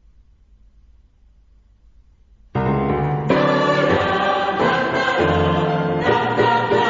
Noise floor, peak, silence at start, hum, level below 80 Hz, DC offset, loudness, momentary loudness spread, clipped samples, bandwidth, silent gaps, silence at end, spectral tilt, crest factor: -52 dBFS; -2 dBFS; 2.55 s; none; -42 dBFS; under 0.1%; -18 LUFS; 4 LU; under 0.1%; 7.6 kHz; none; 0 s; -6.5 dB/octave; 18 dB